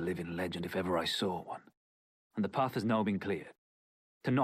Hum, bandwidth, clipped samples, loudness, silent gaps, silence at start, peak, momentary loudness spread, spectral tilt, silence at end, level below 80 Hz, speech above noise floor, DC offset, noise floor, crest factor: none; 15.5 kHz; under 0.1%; -35 LUFS; 1.77-2.30 s, 3.58-4.21 s; 0 s; -18 dBFS; 12 LU; -6 dB/octave; 0 s; -74 dBFS; over 56 dB; under 0.1%; under -90 dBFS; 16 dB